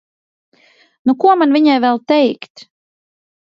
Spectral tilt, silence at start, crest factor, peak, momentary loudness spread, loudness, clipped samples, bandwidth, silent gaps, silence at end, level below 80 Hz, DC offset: -6 dB/octave; 1.05 s; 16 dB; 0 dBFS; 12 LU; -13 LUFS; under 0.1%; 7.2 kHz; 2.50-2.55 s; 0.8 s; -70 dBFS; under 0.1%